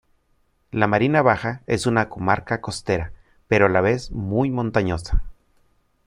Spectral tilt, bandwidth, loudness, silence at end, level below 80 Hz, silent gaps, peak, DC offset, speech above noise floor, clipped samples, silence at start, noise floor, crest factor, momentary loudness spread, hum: -6.5 dB/octave; 11.5 kHz; -21 LUFS; 0.75 s; -34 dBFS; none; -2 dBFS; under 0.1%; 44 dB; under 0.1%; 0.75 s; -64 dBFS; 20 dB; 9 LU; none